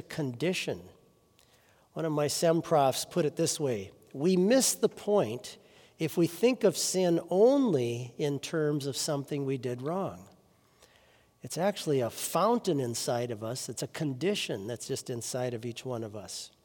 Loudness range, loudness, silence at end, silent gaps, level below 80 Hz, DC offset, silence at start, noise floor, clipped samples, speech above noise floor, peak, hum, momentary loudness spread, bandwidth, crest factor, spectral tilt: 7 LU; -30 LUFS; 0.15 s; none; -74 dBFS; under 0.1%; 0.1 s; -64 dBFS; under 0.1%; 34 dB; -12 dBFS; none; 13 LU; 18 kHz; 18 dB; -4.5 dB/octave